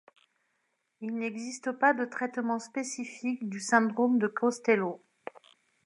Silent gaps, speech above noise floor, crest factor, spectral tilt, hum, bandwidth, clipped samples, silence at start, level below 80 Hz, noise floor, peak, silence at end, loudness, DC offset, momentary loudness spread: none; 49 dB; 22 dB; -4.5 dB/octave; none; 11.5 kHz; under 0.1%; 1 s; -86 dBFS; -78 dBFS; -10 dBFS; 0.9 s; -30 LUFS; under 0.1%; 14 LU